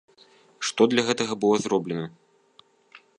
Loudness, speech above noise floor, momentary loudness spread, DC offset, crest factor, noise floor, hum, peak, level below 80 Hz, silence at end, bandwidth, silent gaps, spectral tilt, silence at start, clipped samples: -24 LUFS; 36 dB; 11 LU; under 0.1%; 24 dB; -59 dBFS; none; -4 dBFS; -70 dBFS; 0.2 s; 10.5 kHz; none; -4 dB/octave; 0.6 s; under 0.1%